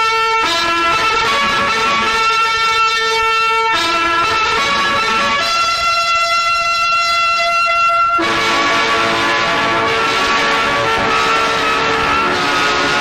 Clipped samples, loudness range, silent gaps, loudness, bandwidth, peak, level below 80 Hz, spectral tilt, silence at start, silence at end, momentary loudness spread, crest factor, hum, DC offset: under 0.1%; 1 LU; none; -13 LUFS; 15 kHz; -4 dBFS; -42 dBFS; -2 dB/octave; 0 s; 0 s; 1 LU; 10 dB; none; 0.3%